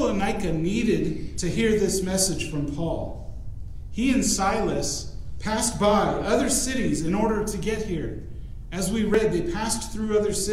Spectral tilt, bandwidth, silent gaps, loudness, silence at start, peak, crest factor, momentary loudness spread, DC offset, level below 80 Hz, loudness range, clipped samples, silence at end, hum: -4.5 dB/octave; 16 kHz; none; -25 LUFS; 0 s; -8 dBFS; 16 dB; 14 LU; under 0.1%; -36 dBFS; 3 LU; under 0.1%; 0 s; none